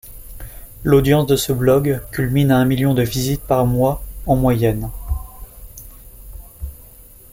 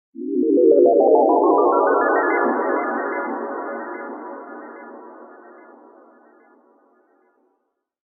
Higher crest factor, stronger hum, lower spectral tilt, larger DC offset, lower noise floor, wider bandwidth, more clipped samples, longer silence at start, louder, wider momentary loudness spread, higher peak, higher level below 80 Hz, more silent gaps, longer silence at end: about the same, 16 dB vs 16 dB; neither; second, -6.5 dB/octave vs -8.5 dB/octave; neither; second, -42 dBFS vs -73 dBFS; first, 17 kHz vs 2.3 kHz; neither; about the same, 0.05 s vs 0.15 s; about the same, -17 LUFS vs -18 LUFS; about the same, 23 LU vs 23 LU; about the same, -2 dBFS vs -4 dBFS; first, -32 dBFS vs -74 dBFS; neither; second, 0.5 s vs 2.85 s